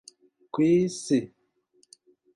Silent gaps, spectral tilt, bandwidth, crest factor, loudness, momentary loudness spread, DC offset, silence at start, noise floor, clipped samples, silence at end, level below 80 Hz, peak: none; -6 dB/octave; 11.5 kHz; 16 dB; -25 LUFS; 13 LU; under 0.1%; 0.55 s; -67 dBFS; under 0.1%; 1.1 s; -68 dBFS; -12 dBFS